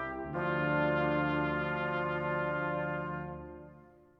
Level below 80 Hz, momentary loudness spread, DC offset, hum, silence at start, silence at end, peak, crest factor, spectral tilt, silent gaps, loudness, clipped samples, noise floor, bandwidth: -56 dBFS; 12 LU; under 0.1%; none; 0 s; 0.35 s; -18 dBFS; 16 dB; -9 dB/octave; none; -33 LUFS; under 0.1%; -57 dBFS; 5.6 kHz